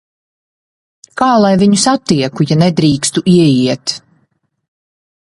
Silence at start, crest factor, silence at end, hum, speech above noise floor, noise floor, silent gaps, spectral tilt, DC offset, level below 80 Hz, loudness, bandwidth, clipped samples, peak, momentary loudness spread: 1.15 s; 14 dB; 1.35 s; none; 51 dB; -61 dBFS; none; -5.5 dB/octave; under 0.1%; -48 dBFS; -11 LUFS; 11.5 kHz; under 0.1%; 0 dBFS; 9 LU